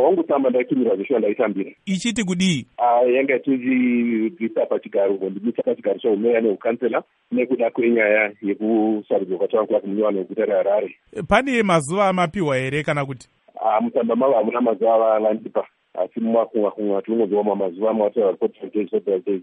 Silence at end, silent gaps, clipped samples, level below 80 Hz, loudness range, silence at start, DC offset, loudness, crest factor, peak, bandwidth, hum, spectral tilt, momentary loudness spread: 0 s; none; under 0.1%; -56 dBFS; 2 LU; 0 s; under 0.1%; -20 LUFS; 18 dB; -2 dBFS; 11 kHz; none; -6 dB/octave; 7 LU